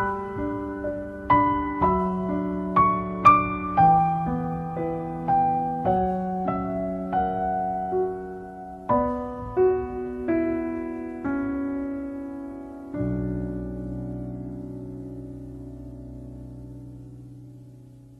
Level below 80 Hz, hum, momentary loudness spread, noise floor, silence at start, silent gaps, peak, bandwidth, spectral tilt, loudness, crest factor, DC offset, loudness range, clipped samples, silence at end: -44 dBFS; none; 20 LU; -47 dBFS; 0 s; none; -4 dBFS; 7.4 kHz; -9.5 dB/octave; -25 LUFS; 22 dB; under 0.1%; 15 LU; under 0.1%; 0 s